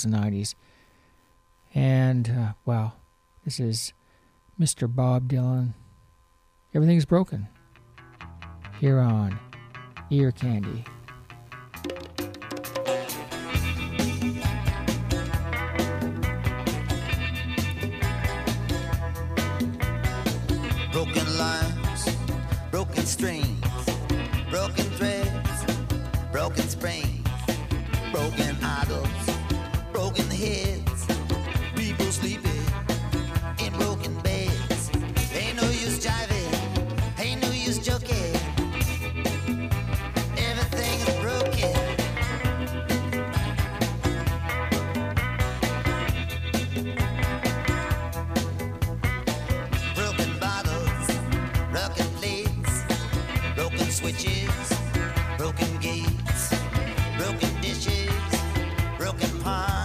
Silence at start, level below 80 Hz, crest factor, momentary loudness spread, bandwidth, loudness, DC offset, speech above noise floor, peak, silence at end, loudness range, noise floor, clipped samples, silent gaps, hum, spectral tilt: 0 s; -34 dBFS; 18 dB; 5 LU; 15.5 kHz; -27 LUFS; under 0.1%; 37 dB; -8 dBFS; 0 s; 2 LU; -61 dBFS; under 0.1%; none; none; -5 dB/octave